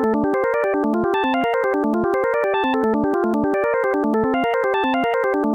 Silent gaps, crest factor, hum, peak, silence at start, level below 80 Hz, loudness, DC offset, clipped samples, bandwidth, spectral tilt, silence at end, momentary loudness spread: none; 10 dB; none; -8 dBFS; 0 s; -50 dBFS; -19 LUFS; under 0.1%; under 0.1%; 16.5 kHz; -7 dB/octave; 0 s; 0 LU